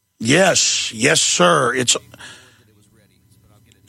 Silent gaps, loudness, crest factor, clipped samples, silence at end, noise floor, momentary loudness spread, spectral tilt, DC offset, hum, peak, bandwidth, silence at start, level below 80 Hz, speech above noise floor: none; -15 LUFS; 18 dB; under 0.1%; 1.55 s; -54 dBFS; 4 LU; -2 dB/octave; under 0.1%; none; -2 dBFS; 16 kHz; 0.2 s; -60 dBFS; 38 dB